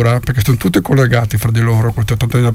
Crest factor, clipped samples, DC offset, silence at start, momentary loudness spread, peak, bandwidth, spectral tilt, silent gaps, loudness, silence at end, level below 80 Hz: 12 dB; under 0.1%; under 0.1%; 0 s; 3 LU; 0 dBFS; 16 kHz; -6.5 dB/octave; none; -13 LUFS; 0 s; -32 dBFS